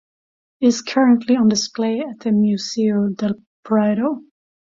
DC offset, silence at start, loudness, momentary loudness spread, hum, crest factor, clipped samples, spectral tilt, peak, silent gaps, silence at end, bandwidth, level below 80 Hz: under 0.1%; 0.6 s; -18 LUFS; 9 LU; none; 14 dB; under 0.1%; -5.5 dB/octave; -4 dBFS; 3.47-3.63 s; 0.45 s; 7.6 kHz; -62 dBFS